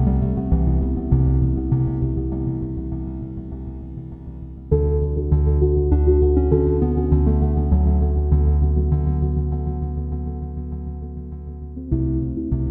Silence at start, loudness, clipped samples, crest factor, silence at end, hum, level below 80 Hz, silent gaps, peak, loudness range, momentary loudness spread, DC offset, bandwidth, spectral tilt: 0 s; -21 LUFS; under 0.1%; 16 dB; 0 s; none; -22 dBFS; none; -2 dBFS; 8 LU; 15 LU; under 0.1%; 2 kHz; -14.5 dB/octave